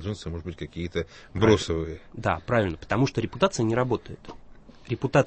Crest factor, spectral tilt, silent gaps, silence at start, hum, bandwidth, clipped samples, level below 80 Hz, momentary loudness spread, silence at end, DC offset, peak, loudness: 20 dB; -6 dB/octave; none; 0 s; none; 8.6 kHz; under 0.1%; -46 dBFS; 14 LU; 0 s; under 0.1%; -6 dBFS; -27 LUFS